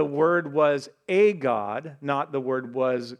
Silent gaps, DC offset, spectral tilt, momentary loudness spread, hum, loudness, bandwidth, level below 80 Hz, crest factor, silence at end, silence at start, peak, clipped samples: none; under 0.1%; -6.5 dB/octave; 8 LU; none; -24 LUFS; 10 kHz; -82 dBFS; 16 dB; 0.05 s; 0 s; -8 dBFS; under 0.1%